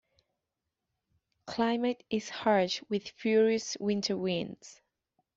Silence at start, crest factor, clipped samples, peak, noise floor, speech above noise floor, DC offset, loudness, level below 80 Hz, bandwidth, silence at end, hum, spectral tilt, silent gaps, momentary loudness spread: 1.45 s; 18 dB; under 0.1%; -14 dBFS; -87 dBFS; 57 dB; under 0.1%; -30 LUFS; -72 dBFS; 7.8 kHz; 0.65 s; none; -4.5 dB/octave; none; 9 LU